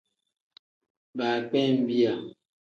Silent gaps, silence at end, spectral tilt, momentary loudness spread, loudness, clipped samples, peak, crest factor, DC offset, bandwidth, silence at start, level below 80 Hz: none; 0.5 s; -7 dB/octave; 14 LU; -26 LUFS; under 0.1%; -12 dBFS; 16 dB; under 0.1%; 7 kHz; 1.15 s; -76 dBFS